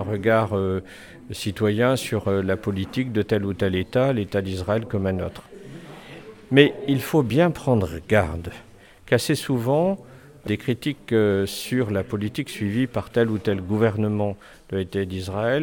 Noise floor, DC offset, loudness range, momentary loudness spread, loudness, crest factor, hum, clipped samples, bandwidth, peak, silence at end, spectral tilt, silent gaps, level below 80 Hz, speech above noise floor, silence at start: -42 dBFS; under 0.1%; 3 LU; 17 LU; -23 LUFS; 22 dB; none; under 0.1%; 19 kHz; -2 dBFS; 0 s; -6.5 dB/octave; none; -50 dBFS; 20 dB; 0 s